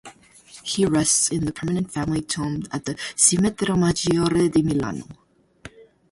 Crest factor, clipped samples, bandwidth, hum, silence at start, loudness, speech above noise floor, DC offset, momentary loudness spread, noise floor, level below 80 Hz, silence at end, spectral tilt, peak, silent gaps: 20 dB; under 0.1%; 11.5 kHz; none; 0.05 s; -21 LUFS; 27 dB; under 0.1%; 11 LU; -48 dBFS; -48 dBFS; 0.3 s; -4 dB/octave; -2 dBFS; none